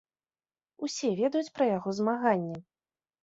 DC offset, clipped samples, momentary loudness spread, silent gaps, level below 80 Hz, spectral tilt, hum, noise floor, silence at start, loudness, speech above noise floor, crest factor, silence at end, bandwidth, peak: under 0.1%; under 0.1%; 11 LU; none; -74 dBFS; -5.5 dB/octave; none; under -90 dBFS; 0.8 s; -30 LUFS; over 61 dB; 18 dB; 0.65 s; 8 kHz; -12 dBFS